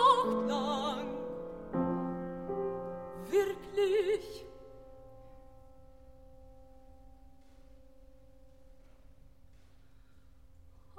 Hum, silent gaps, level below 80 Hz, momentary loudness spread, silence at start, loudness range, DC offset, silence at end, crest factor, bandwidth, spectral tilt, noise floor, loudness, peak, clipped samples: none; none; -60 dBFS; 25 LU; 0 s; 20 LU; 0.1%; 2.25 s; 22 dB; 15.5 kHz; -5.5 dB/octave; -61 dBFS; -34 LUFS; -14 dBFS; under 0.1%